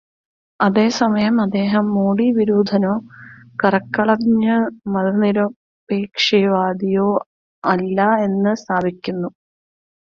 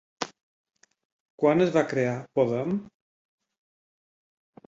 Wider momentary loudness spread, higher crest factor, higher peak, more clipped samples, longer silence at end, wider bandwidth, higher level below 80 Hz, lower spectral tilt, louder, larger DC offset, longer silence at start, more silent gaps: second, 8 LU vs 14 LU; about the same, 16 dB vs 20 dB; first, -2 dBFS vs -8 dBFS; neither; second, 0.9 s vs 1.8 s; about the same, 7.2 kHz vs 7.8 kHz; first, -58 dBFS vs -68 dBFS; about the same, -6.5 dB/octave vs -6.5 dB/octave; first, -18 LUFS vs -26 LUFS; neither; first, 0.6 s vs 0.2 s; first, 5.56-5.87 s, 7.26-7.62 s vs 0.43-0.64 s, 1.05-1.38 s